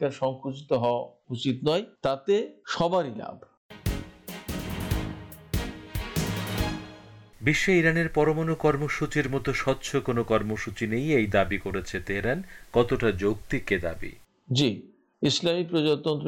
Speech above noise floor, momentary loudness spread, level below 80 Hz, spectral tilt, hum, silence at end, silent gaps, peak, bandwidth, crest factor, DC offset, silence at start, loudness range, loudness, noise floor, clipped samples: 22 dB; 12 LU; -44 dBFS; -5.5 dB/octave; none; 0 s; 3.57-3.69 s; -8 dBFS; 18 kHz; 20 dB; under 0.1%; 0 s; 7 LU; -27 LUFS; -48 dBFS; under 0.1%